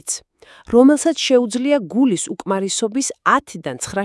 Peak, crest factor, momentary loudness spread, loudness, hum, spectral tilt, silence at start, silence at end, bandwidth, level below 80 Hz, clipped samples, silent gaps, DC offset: 0 dBFS; 18 dB; 12 LU; -17 LUFS; none; -3.5 dB/octave; 0.05 s; 0 s; 12 kHz; -54 dBFS; under 0.1%; none; under 0.1%